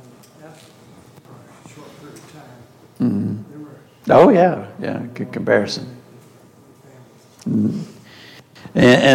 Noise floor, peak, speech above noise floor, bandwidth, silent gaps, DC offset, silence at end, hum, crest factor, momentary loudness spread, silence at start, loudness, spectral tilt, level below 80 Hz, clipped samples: -47 dBFS; 0 dBFS; 31 dB; 16 kHz; none; under 0.1%; 0 s; none; 18 dB; 29 LU; 0.45 s; -17 LUFS; -6 dB/octave; -56 dBFS; under 0.1%